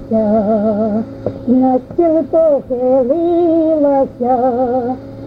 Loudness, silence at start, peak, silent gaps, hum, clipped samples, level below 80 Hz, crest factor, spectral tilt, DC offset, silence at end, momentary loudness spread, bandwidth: -14 LUFS; 0 s; -2 dBFS; none; none; under 0.1%; -44 dBFS; 12 dB; -10.5 dB/octave; under 0.1%; 0 s; 6 LU; 5.2 kHz